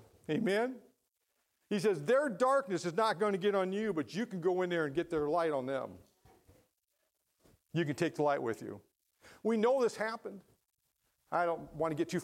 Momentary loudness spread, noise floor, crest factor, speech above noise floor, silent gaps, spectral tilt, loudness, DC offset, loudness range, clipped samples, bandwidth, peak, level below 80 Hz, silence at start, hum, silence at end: 9 LU; -82 dBFS; 16 dB; 49 dB; none; -6 dB/octave; -34 LUFS; under 0.1%; 6 LU; under 0.1%; 15.5 kHz; -18 dBFS; -72 dBFS; 0.3 s; none; 0 s